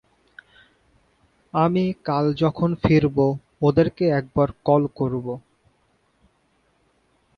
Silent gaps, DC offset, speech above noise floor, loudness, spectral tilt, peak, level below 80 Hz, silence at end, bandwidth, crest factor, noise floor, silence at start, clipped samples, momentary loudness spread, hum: none; under 0.1%; 45 dB; -21 LUFS; -9.5 dB/octave; -4 dBFS; -48 dBFS; 2 s; 6.4 kHz; 18 dB; -65 dBFS; 1.55 s; under 0.1%; 7 LU; none